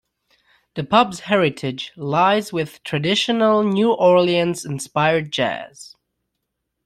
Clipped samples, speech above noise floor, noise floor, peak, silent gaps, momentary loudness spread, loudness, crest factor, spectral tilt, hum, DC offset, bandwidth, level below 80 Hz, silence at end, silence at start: under 0.1%; 58 dB; -77 dBFS; 0 dBFS; none; 12 LU; -19 LUFS; 18 dB; -5 dB/octave; none; under 0.1%; 14 kHz; -60 dBFS; 1 s; 0.75 s